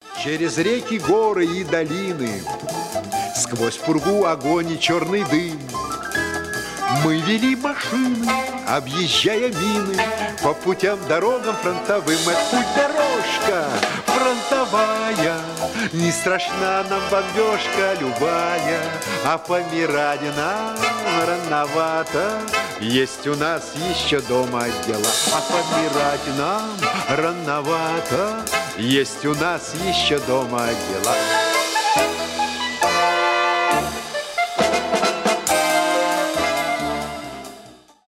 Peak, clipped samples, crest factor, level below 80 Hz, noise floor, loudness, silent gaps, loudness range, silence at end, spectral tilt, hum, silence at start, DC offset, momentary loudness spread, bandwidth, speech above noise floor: -4 dBFS; under 0.1%; 16 dB; -52 dBFS; -45 dBFS; -20 LUFS; none; 2 LU; 0.3 s; -3.5 dB/octave; none; 0.05 s; under 0.1%; 6 LU; 16 kHz; 24 dB